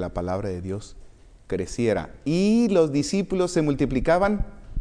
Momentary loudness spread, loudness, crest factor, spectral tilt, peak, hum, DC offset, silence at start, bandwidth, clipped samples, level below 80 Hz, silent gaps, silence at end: 12 LU; -24 LUFS; 16 dB; -6.5 dB/octave; -8 dBFS; none; under 0.1%; 0 s; 10.5 kHz; under 0.1%; -38 dBFS; none; 0 s